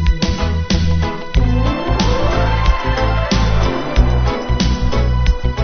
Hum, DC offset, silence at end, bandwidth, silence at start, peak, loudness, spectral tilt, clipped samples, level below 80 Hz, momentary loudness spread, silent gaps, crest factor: none; under 0.1%; 0 s; 6.6 kHz; 0 s; 0 dBFS; -17 LUFS; -6 dB/octave; under 0.1%; -16 dBFS; 2 LU; none; 14 dB